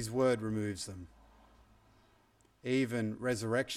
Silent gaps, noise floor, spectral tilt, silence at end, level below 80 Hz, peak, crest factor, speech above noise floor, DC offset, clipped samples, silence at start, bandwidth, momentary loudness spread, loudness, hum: none; -68 dBFS; -5.5 dB/octave; 0 s; -64 dBFS; -20 dBFS; 16 dB; 34 dB; under 0.1%; under 0.1%; 0 s; 15.5 kHz; 14 LU; -35 LUFS; none